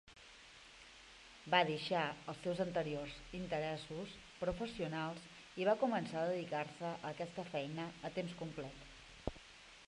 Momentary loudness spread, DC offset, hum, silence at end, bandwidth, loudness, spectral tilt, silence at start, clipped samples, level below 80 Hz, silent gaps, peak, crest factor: 21 LU; under 0.1%; none; 0.05 s; 11.5 kHz; -41 LUFS; -5.5 dB/octave; 0.05 s; under 0.1%; -64 dBFS; none; -16 dBFS; 26 dB